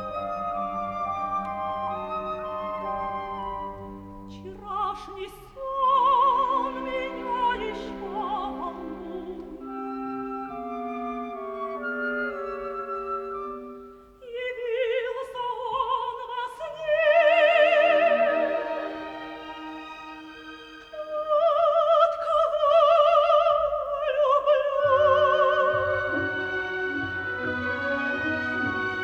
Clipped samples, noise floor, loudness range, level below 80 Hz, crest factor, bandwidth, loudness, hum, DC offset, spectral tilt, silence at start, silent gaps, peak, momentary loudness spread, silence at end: under 0.1%; -46 dBFS; 11 LU; -56 dBFS; 18 dB; 7.6 kHz; -25 LUFS; none; under 0.1%; -5.5 dB/octave; 0 s; none; -8 dBFS; 18 LU; 0 s